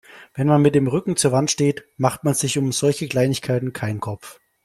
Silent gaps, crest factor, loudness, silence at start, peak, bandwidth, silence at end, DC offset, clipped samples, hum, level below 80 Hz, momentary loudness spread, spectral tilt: none; 18 dB; -20 LUFS; 0.15 s; -2 dBFS; 15 kHz; 0.35 s; under 0.1%; under 0.1%; none; -56 dBFS; 10 LU; -5 dB/octave